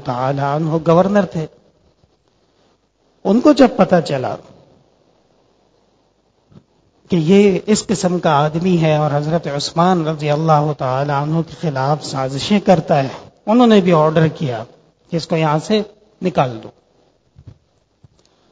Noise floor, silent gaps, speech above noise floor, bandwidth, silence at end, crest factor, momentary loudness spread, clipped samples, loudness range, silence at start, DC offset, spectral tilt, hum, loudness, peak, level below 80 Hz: -59 dBFS; none; 45 dB; 8 kHz; 1 s; 16 dB; 13 LU; under 0.1%; 6 LU; 0 s; under 0.1%; -6.5 dB/octave; none; -16 LUFS; 0 dBFS; -50 dBFS